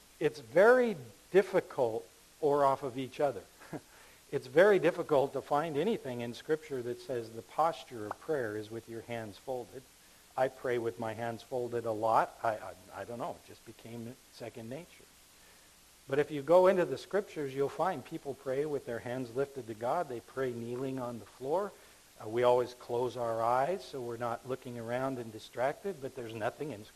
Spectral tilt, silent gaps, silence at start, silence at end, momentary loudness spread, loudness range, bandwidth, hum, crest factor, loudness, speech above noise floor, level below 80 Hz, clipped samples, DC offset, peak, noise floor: -6 dB/octave; none; 0.2 s; 0.05 s; 16 LU; 7 LU; 14 kHz; none; 22 dB; -33 LUFS; 27 dB; -70 dBFS; under 0.1%; under 0.1%; -12 dBFS; -60 dBFS